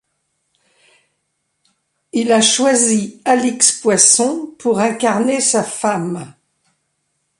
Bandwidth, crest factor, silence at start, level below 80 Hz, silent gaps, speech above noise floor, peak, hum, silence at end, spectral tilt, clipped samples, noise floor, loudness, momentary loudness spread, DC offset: 12.5 kHz; 18 dB; 2.15 s; -62 dBFS; none; 55 dB; 0 dBFS; none; 1.1 s; -2.5 dB/octave; under 0.1%; -70 dBFS; -14 LUFS; 11 LU; under 0.1%